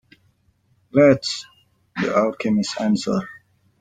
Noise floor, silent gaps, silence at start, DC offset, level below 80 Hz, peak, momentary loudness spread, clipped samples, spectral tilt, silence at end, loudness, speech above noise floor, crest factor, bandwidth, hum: -63 dBFS; none; 0.95 s; under 0.1%; -60 dBFS; -2 dBFS; 14 LU; under 0.1%; -5.5 dB/octave; 0.5 s; -20 LUFS; 44 dB; 20 dB; 9.4 kHz; none